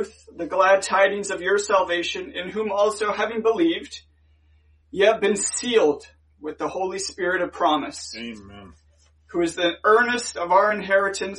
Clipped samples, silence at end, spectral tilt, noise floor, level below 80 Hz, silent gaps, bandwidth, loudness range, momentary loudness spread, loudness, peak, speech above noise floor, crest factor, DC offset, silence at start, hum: under 0.1%; 0 s; -2.5 dB/octave; -58 dBFS; -58 dBFS; none; 11.5 kHz; 4 LU; 15 LU; -22 LUFS; -6 dBFS; 36 dB; 18 dB; under 0.1%; 0 s; none